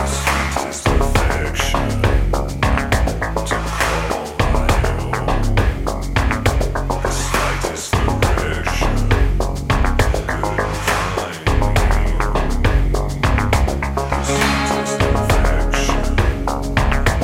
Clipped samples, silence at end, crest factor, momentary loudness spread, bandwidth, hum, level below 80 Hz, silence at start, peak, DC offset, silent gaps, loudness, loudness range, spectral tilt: under 0.1%; 0 s; 16 dB; 4 LU; 16 kHz; none; -20 dBFS; 0 s; 0 dBFS; under 0.1%; none; -18 LUFS; 1 LU; -5 dB/octave